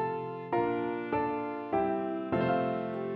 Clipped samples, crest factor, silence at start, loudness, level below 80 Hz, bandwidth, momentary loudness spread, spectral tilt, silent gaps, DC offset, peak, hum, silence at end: under 0.1%; 14 dB; 0 s; -32 LUFS; -62 dBFS; 5.2 kHz; 5 LU; -9.5 dB/octave; none; under 0.1%; -18 dBFS; none; 0 s